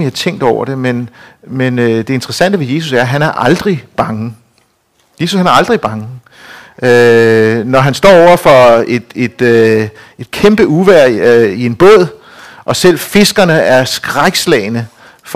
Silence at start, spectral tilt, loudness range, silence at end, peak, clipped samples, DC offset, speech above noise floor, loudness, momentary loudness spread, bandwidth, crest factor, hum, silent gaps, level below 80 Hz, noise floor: 0 s; -5 dB/octave; 6 LU; 0 s; 0 dBFS; 2%; 0.6%; 46 dB; -9 LUFS; 13 LU; 16 kHz; 10 dB; none; none; -42 dBFS; -55 dBFS